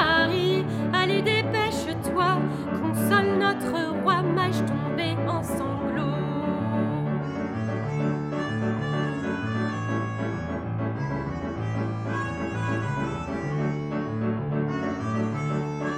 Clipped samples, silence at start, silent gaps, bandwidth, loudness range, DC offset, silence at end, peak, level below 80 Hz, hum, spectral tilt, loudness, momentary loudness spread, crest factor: under 0.1%; 0 s; none; 16 kHz; 5 LU; under 0.1%; 0 s; -8 dBFS; -50 dBFS; none; -6.5 dB/octave; -26 LUFS; 7 LU; 18 dB